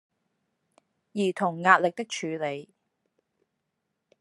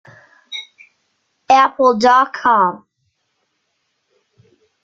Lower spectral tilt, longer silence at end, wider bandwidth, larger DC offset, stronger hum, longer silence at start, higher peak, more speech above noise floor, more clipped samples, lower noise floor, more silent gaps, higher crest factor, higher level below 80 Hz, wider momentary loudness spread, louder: about the same, -4.5 dB/octave vs -4 dB/octave; second, 1.55 s vs 2.1 s; first, 12 kHz vs 7.8 kHz; neither; neither; first, 1.15 s vs 0.5 s; about the same, -2 dBFS vs -2 dBFS; about the same, 55 dB vs 56 dB; neither; first, -81 dBFS vs -69 dBFS; neither; first, 26 dB vs 16 dB; second, -84 dBFS vs -62 dBFS; second, 14 LU vs 19 LU; second, -26 LUFS vs -13 LUFS